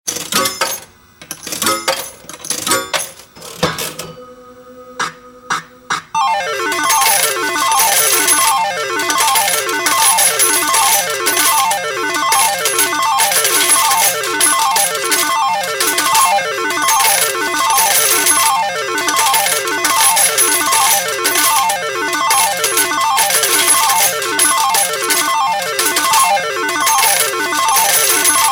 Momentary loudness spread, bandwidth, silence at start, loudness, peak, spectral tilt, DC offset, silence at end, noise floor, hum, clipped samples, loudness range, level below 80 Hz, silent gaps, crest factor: 10 LU; 17 kHz; 0.05 s; -12 LUFS; 0 dBFS; 0.5 dB/octave; under 0.1%; 0 s; -40 dBFS; none; under 0.1%; 8 LU; -56 dBFS; none; 14 dB